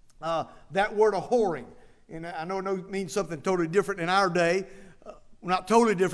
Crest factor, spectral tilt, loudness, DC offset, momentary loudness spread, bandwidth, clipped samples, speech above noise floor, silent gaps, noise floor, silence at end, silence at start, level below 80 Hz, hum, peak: 18 dB; -5 dB/octave; -27 LUFS; under 0.1%; 15 LU; 11 kHz; under 0.1%; 22 dB; none; -48 dBFS; 0 s; 0.2 s; -56 dBFS; none; -8 dBFS